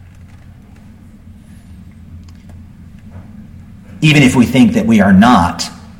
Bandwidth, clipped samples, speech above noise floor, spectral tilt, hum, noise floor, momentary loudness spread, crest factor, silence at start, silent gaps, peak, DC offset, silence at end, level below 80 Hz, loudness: 16.5 kHz; under 0.1%; 29 dB; -6 dB/octave; none; -38 dBFS; 8 LU; 14 dB; 1.7 s; none; 0 dBFS; under 0.1%; 0.2 s; -40 dBFS; -10 LUFS